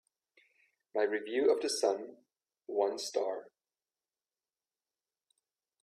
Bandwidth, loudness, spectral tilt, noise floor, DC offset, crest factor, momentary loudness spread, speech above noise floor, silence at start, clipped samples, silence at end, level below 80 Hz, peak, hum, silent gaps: 14 kHz; -33 LUFS; -2 dB/octave; under -90 dBFS; under 0.1%; 20 dB; 13 LU; over 58 dB; 0.95 s; under 0.1%; 2.35 s; -86 dBFS; -18 dBFS; none; none